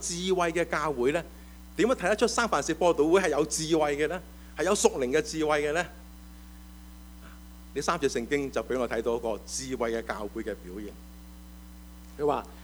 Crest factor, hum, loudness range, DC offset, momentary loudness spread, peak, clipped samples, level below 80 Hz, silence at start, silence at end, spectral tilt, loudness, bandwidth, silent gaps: 22 dB; none; 7 LU; under 0.1%; 24 LU; -6 dBFS; under 0.1%; -48 dBFS; 0 s; 0 s; -4 dB/octave; -28 LUFS; over 20 kHz; none